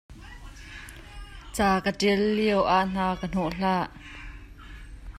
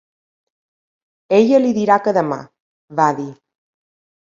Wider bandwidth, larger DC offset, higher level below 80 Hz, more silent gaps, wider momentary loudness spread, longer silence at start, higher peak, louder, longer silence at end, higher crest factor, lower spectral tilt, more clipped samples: first, 15 kHz vs 7.6 kHz; neither; first, -44 dBFS vs -66 dBFS; second, none vs 2.60-2.88 s; first, 22 LU vs 14 LU; second, 0.1 s vs 1.3 s; second, -10 dBFS vs 0 dBFS; second, -25 LUFS vs -16 LUFS; second, 0 s vs 0.9 s; about the same, 18 dB vs 18 dB; about the same, -5.5 dB/octave vs -6.5 dB/octave; neither